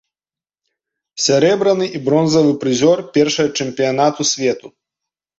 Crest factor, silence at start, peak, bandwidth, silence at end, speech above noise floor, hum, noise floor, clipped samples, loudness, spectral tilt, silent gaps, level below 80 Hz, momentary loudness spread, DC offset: 16 dB; 1.15 s; -2 dBFS; 8 kHz; 0.7 s; over 75 dB; none; under -90 dBFS; under 0.1%; -15 LUFS; -4 dB/octave; none; -60 dBFS; 6 LU; under 0.1%